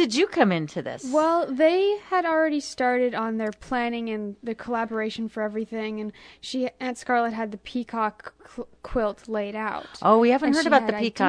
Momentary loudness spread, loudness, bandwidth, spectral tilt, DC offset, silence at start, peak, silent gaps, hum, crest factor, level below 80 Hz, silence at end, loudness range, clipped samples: 13 LU; -25 LUFS; 10.5 kHz; -5 dB/octave; under 0.1%; 0 s; -4 dBFS; none; none; 20 dB; -54 dBFS; 0 s; 6 LU; under 0.1%